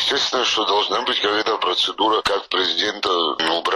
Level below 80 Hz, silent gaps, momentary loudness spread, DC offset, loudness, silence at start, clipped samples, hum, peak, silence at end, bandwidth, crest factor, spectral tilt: -56 dBFS; none; 2 LU; under 0.1%; -19 LUFS; 0 s; under 0.1%; none; -4 dBFS; 0 s; 14.5 kHz; 16 dB; -1.5 dB/octave